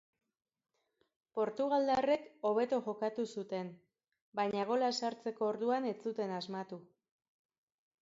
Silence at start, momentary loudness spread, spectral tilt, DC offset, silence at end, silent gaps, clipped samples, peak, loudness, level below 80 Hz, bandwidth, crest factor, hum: 1.35 s; 12 LU; -4 dB/octave; under 0.1%; 1.2 s; 4.22-4.32 s; under 0.1%; -20 dBFS; -36 LUFS; -80 dBFS; 7.6 kHz; 18 dB; none